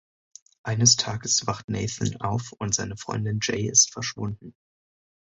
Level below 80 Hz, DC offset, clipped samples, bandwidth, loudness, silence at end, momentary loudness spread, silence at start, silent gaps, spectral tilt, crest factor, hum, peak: -52 dBFS; under 0.1%; under 0.1%; 8 kHz; -24 LUFS; 0.7 s; 13 LU; 0.65 s; 1.64-1.68 s; -2.5 dB/octave; 24 dB; none; -4 dBFS